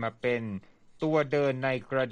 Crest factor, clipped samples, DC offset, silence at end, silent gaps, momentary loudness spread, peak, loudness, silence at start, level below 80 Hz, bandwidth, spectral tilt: 16 dB; under 0.1%; under 0.1%; 0 s; none; 10 LU; -12 dBFS; -29 LUFS; 0 s; -66 dBFS; 9.4 kHz; -7.5 dB/octave